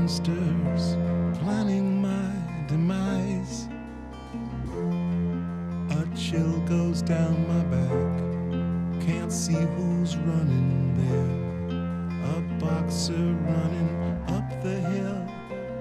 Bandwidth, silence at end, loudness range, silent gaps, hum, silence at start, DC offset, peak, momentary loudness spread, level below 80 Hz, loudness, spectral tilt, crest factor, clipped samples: 12 kHz; 0 s; 3 LU; none; none; 0 s; under 0.1%; -14 dBFS; 7 LU; -46 dBFS; -27 LUFS; -7 dB/octave; 12 dB; under 0.1%